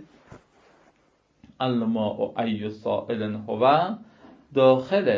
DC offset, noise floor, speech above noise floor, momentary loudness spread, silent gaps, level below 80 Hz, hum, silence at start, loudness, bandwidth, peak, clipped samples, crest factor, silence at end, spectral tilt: under 0.1%; -65 dBFS; 42 dB; 10 LU; none; -64 dBFS; none; 0 s; -24 LUFS; 7.2 kHz; -6 dBFS; under 0.1%; 20 dB; 0 s; -8 dB/octave